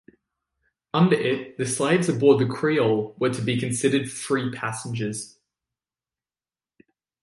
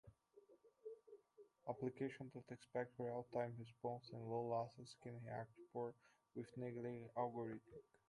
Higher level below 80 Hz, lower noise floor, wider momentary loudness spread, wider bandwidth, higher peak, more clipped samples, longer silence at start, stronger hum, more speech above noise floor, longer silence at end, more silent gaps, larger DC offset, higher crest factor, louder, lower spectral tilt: first, -64 dBFS vs -84 dBFS; first, under -90 dBFS vs -72 dBFS; second, 10 LU vs 13 LU; about the same, 11.5 kHz vs 11 kHz; first, -4 dBFS vs -30 dBFS; neither; first, 0.95 s vs 0.05 s; neither; first, over 67 dB vs 22 dB; first, 1.95 s vs 0.25 s; neither; neither; about the same, 20 dB vs 20 dB; first, -23 LUFS vs -50 LUFS; second, -5.5 dB/octave vs -7.5 dB/octave